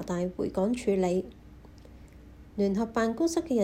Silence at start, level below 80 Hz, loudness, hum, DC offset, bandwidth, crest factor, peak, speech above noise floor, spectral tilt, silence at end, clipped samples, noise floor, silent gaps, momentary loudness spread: 0 s; -52 dBFS; -29 LUFS; none; under 0.1%; 16 kHz; 16 dB; -14 dBFS; 22 dB; -6.5 dB/octave; 0 s; under 0.1%; -50 dBFS; none; 5 LU